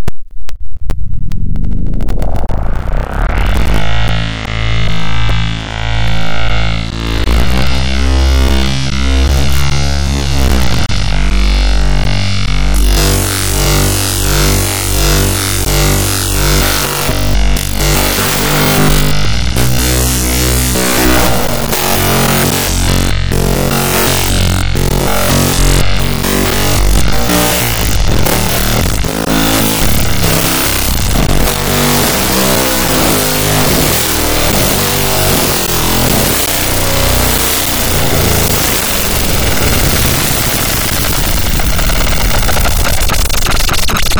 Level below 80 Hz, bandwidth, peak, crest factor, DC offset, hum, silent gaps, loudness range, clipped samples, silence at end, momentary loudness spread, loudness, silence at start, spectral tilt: -16 dBFS; over 20 kHz; 0 dBFS; 10 dB; under 0.1%; none; none; 6 LU; under 0.1%; 0 s; 6 LU; -12 LUFS; 0 s; -3.5 dB/octave